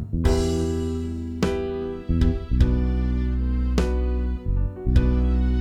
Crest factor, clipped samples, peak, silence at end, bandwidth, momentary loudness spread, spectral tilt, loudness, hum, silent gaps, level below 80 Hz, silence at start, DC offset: 16 dB; under 0.1%; -6 dBFS; 0 s; 9.8 kHz; 6 LU; -7.5 dB/octave; -24 LUFS; none; none; -24 dBFS; 0 s; under 0.1%